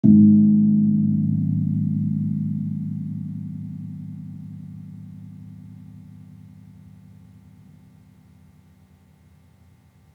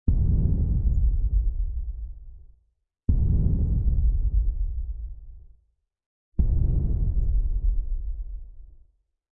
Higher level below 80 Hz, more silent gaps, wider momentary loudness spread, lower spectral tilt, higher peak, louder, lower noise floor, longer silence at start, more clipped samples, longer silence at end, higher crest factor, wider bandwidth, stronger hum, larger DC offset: second, -64 dBFS vs -26 dBFS; second, none vs 6.06-6.32 s; first, 26 LU vs 15 LU; second, -13 dB/octave vs -14.5 dB/octave; first, -2 dBFS vs -10 dBFS; first, -20 LUFS vs -27 LUFS; second, -54 dBFS vs -70 dBFS; about the same, 0.05 s vs 0.05 s; neither; first, 4 s vs 0.55 s; first, 20 dB vs 14 dB; second, 0.9 kHz vs 1 kHz; neither; neither